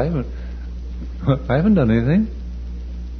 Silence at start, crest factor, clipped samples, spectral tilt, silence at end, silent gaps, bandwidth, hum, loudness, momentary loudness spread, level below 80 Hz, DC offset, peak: 0 s; 16 dB; under 0.1%; -10 dB/octave; 0 s; none; 6.2 kHz; none; -19 LUFS; 16 LU; -28 dBFS; under 0.1%; -4 dBFS